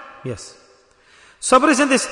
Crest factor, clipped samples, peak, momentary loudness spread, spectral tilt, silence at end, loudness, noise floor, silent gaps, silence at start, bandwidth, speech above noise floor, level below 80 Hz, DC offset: 18 dB; under 0.1%; -2 dBFS; 20 LU; -3 dB/octave; 0 s; -15 LUFS; -52 dBFS; none; 0 s; 11 kHz; 35 dB; -56 dBFS; under 0.1%